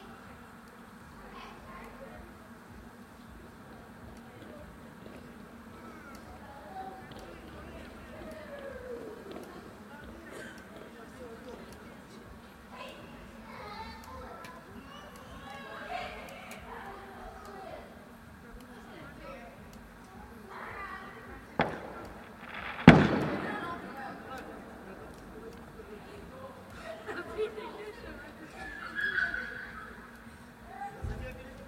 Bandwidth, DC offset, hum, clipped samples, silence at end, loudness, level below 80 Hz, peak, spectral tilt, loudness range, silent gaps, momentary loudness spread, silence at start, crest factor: 16 kHz; under 0.1%; none; under 0.1%; 0 s; -34 LUFS; -54 dBFS; 0 dBFS; -6.5 dB/octave; 21 LU; none; 16 LU; 0 s; 36 dB